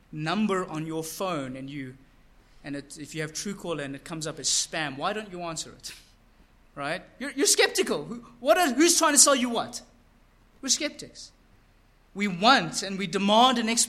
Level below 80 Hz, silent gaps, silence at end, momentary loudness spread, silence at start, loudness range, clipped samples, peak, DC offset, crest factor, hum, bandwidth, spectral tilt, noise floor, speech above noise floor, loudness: -60 dBFS; none; 0 s; 19 LU; 0.1 s; 11 LU; under 0.1%; -2 dBFS; under 0.1%; 24 dB; none; 16 kHz; -2 dB/octave; -60 dBFS; 33 dB; -25 LUFS